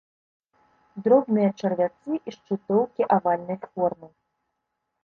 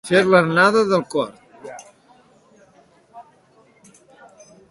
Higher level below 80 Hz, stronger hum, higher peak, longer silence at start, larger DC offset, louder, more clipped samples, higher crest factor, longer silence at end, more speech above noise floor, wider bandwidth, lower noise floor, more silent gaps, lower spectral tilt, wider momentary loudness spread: about the same, -68 dBFS vs -64 dBFS; neither; second, -6 dBFS vs -2 dBFS; first, 0.95 s vs 0.05 s; neither; second, -24 LUFS vs -17 LUFS; neither; about the same, 20 dB vs 20 dB; second, 0.95 s vs 1.5 s; first, 56 dB vs 39 dB; second, 6.6 kHz vs 11.5 kHz; first, -80 dBFS vs -55 dBFS; neither; first, -8.5 dB/octave vs -5.5 dB/octave; second, 12 LU vs 25 LU